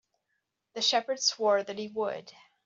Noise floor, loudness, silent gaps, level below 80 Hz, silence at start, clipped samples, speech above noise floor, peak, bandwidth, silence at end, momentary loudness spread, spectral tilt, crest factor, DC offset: -81 dBFS; -28 LUFS; none; -82 dBFS; 0.75 s; under 0.1%; 51 dB; -12 dBFS; 8 kHz; 0.35 s; 12 LU; -1 dB/octave; 20 dB; under 0.1%